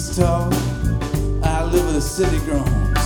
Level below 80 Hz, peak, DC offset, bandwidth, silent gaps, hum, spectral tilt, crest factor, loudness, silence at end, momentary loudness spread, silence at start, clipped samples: -24 dBFS; -4 dBFS; under 0.1%; 19.5 kHz; none; none; -6 dB/octave; 14 dB; -20 LUFS; 0 s; 3 LU; 0 s; under 0.1%